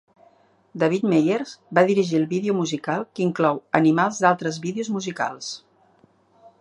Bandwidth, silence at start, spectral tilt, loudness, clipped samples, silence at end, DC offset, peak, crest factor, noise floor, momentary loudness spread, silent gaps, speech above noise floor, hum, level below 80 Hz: 11 kHz; 0.75 s; -5.5 dB/octave; -22 LUFS; under 0.1%; 1 s; under 0.1%; 0 dBFS; 22 dB; -59 dBFS; 9 LU; none; 37 dB; none; -70 dBFS